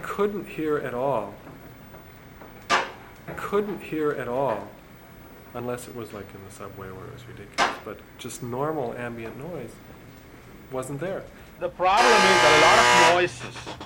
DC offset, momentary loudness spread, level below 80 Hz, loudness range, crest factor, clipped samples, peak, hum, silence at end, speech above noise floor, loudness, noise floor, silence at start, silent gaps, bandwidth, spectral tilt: under 0.1%; 24 LU; -52 dBFS; 15 LU; 22 dB; under 0.1%; -4 dBFS; none; 0 s; 23 dB; -22 LUFS; -47 dBFS; 0 s; none; 17 kHz; -3 dB/octave